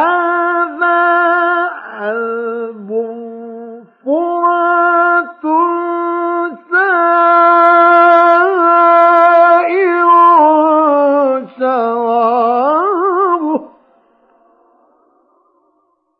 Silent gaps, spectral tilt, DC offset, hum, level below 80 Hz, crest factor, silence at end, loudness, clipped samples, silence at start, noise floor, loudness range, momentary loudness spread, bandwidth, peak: none; -6.5 dB/octave; under 0.1%; none; -78 dBFS; 12 dB; 2.55 s; -11 LUFS; under 0.1%; 0 s; -61 dBFS; 9 LU; 13 LU; 5 kHz; 0 dBFS